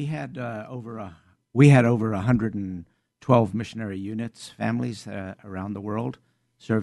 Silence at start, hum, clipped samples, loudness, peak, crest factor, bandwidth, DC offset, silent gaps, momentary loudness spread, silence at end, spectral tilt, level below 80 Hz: 0 s; none; under 0.1%; -24 LUFS; -4 dBFS; 20 dB; 11 kHz; under 0.1%; none; 18 LU; 0 s; -8 dB/octave; -56 dBFS